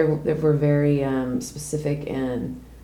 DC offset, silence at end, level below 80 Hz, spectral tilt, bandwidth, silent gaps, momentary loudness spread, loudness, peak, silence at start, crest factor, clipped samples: under 0.1%; 0.05 s; -46 dBFS; -7.5 dB/octave; 14.5 kHz; none; 10 LU; -23 LUFS; -6 dBFS; 0 s; 16 dB; under 0.1%